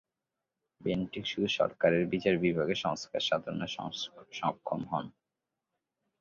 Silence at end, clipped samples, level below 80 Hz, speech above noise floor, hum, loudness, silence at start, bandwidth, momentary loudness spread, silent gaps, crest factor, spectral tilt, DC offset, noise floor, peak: 1.1 s; under 0.1%; -64 dBFS; 57 dB; none; -32 LUFS; 0.8 s; 7.6 kHz; 10 LU; none; 22 dB; -5.5 dB/octave; under 0.1%; -88 dBFS; -12 dBFS